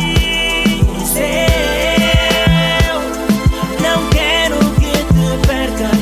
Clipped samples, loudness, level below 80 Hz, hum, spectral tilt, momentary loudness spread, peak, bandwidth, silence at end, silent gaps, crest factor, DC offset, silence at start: under 0.1%; -13 LUFS; -20 dBFS; none; -4.5 dB/octave; 4 LU; 0 dBFS; 16 kHz; 0 s; none; 12 dB; under 0.1%; 0 s